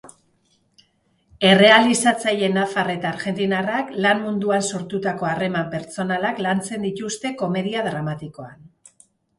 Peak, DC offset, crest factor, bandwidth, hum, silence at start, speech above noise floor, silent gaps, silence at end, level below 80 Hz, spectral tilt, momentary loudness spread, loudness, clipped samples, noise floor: 0 dBFS; under 0.1%; 22 dB; 11.5 kHz; none; 0.05 s; 44 dB; none; 0.7 s; -62 dBFS; -4 dB/octave; 14 LU; -20 LUFS; under 0.1%; -64 dBFS